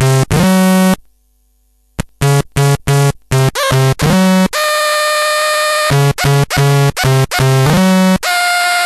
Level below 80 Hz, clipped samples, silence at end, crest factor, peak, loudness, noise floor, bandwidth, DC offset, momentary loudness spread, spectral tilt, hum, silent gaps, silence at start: -34 dBFS; under 0.1%; 0 s; 12 dB; 0 dBFS; -11 LUFS; -55 dBFS; 14 kHz; under 0.1%; 4 LU; -5 dB/octave; none; none; 0 s